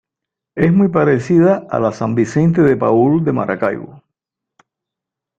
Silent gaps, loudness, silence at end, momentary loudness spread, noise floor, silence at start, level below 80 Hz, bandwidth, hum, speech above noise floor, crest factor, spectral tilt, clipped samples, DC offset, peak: none; -14 LUFS; 1.45 s; 7 LU; -83 dBFS; 0.55 s; -52 dBFS; 8 kHz; none; 70 dB; 14 dB; -9 dB/octave; under 0.1%; under 0.1%; 0 dBFS